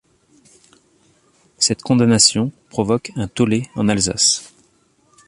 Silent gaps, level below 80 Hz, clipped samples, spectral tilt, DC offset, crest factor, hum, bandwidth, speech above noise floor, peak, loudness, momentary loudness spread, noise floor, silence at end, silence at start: none; -48 dBFS; under 0.1%; -3.5 dB/octave; under 0.1%; 20 dB; none; 11.5 kHz; 42 dB; 0 dBFS; -17 LUFS; 11 LU; -59 dBFS; 0.8 s; 1.6 s